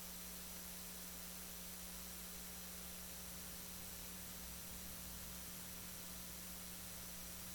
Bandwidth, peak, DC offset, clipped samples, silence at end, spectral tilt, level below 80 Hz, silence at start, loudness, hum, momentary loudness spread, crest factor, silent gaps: 19 kHz; -32 dBFS; under 0.1%; under 0.1%; 0 s; -2 dB/octave; -62 dBFS; 0 s; -49 LUFS; 60 Hz at -60 dBFS; 0 LU; 18 dB; none